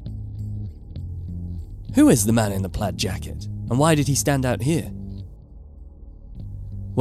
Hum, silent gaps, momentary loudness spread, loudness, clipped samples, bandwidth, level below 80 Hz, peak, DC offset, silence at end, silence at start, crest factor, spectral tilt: none; none; 19 LU; -22 LUFS; under 0.1%; 15.5 kHz; -38 dBFS; -4 dBFS; under 0.1%; 0 s; 0 s; 20 dB; -5.5 dB/octave